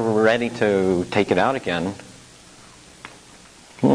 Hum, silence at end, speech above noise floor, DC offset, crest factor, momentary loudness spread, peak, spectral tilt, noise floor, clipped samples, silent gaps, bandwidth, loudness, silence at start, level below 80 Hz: none; 0 s; 27 dB; under 0.1%; 18 dB; 23 LU; -4 dBFS; -6 dB/octave; -47 dBFS; under 0.1%; none; 11 kHz; -21 LUFS; 0 s; -56 dBFS